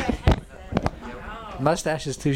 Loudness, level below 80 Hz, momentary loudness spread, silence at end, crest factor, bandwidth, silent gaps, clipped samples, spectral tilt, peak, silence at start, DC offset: -26 LUFS; -32 dBFS; 13 LU; 0 s; 18 dB; 16.5 kHz; none; under 0.1%; -6 dB/octave; -6 dBFS; 0 s; under 0.1%